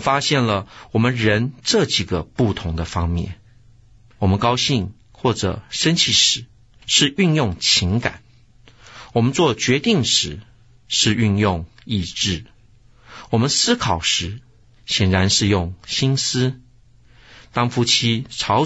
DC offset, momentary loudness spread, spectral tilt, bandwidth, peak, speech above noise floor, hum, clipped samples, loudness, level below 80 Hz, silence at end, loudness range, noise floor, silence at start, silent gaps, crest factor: 0.1%; 9 LU; -4 dB/octave; 8.2 kHz; -2 dBFS; 33 dB; none; under 0.1%; -18 LUFS; -42 dBFS; 0 s; 4 LU; -52 dBFS; 0 s; none; 18 dB